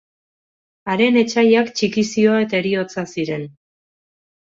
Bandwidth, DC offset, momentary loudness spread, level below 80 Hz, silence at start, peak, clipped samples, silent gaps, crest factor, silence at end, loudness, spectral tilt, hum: 7.8 kHz; under 0.1%; 11 LU; -62 dBFS; 0.85 s; -2 dBFS; under 0.1%; none; 16 dB; 1 s; -18 LUFS; -5 dB/octave; none